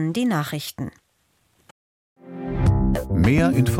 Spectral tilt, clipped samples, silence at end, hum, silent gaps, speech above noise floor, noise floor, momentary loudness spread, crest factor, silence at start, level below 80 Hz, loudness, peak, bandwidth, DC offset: -7 dB/octave; under 0.1%; 0 s; none; 1.71-2.16 s; 46 dB; -66 dBFS; 17 LU; 16 dB; 0 s; -32 dBFS; -21 LUFS; -6 dBFS; 16.5 kHz; under 0.1%